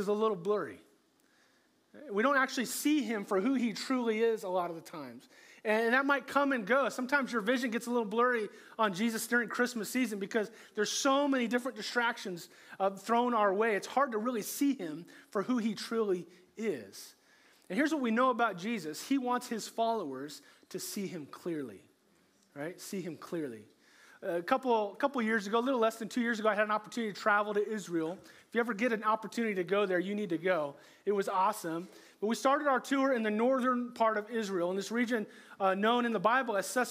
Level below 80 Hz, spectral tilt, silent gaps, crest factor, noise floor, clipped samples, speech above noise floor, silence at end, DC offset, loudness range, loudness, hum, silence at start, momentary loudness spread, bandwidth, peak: -90 dBFS; -4 dB/octave; none; 20 dB; -70 dBFS; under 0.1%; 37 dB; 0 s; under 0.1%; 6 LU; -32 LUFS; none; 0 s; 12 LU; 16 kHz; -12 dBFS